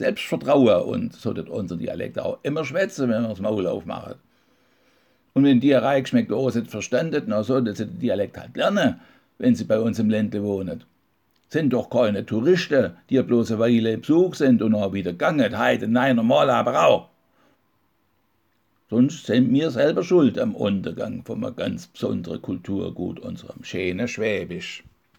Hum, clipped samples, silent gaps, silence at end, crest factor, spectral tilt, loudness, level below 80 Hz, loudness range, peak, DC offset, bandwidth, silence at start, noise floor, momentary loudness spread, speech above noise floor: none; under 0.1%; none; 0.4 s; 18 dB; -6.5 dB/octave; -22 LUFS; -62 dBFS; 7 LU; -4 dBFS; under 0.1%; 17.5 kHz; 0 s; -68 dBFS; 12 LU; 47 dB